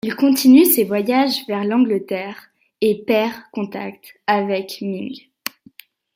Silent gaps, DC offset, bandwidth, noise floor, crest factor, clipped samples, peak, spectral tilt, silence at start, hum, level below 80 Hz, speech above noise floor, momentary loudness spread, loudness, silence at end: none; under 0.1%; 16.5 kHz; -48 dBFS; 16 dB; under 0.1%; -2 dBFS; -4.5 dB/octave; 0.05 s; none; -66 dBFS; 30 dB; 19 LU; -18 LUFS; 0.95 s